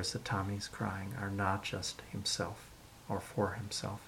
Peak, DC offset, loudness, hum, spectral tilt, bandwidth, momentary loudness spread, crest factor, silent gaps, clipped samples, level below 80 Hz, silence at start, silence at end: -18 dBFS; under 0.1%; -38 LUFS; none; -4 dB/octave; 17 kHz; 7 LU; 20 dB; none; under 0.1%; -62 dBFS; 0 s; 0 s